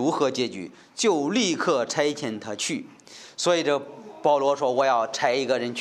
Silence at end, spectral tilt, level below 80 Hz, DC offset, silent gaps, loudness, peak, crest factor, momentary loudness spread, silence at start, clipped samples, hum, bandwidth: 0 s; -3.5 dB/octave; -76 dBFS; under 0.1%; none; -24 LUFS; -6 dBFS; 18 dB; 14 LU; 0 s; under 0.1%; none; 13 kHz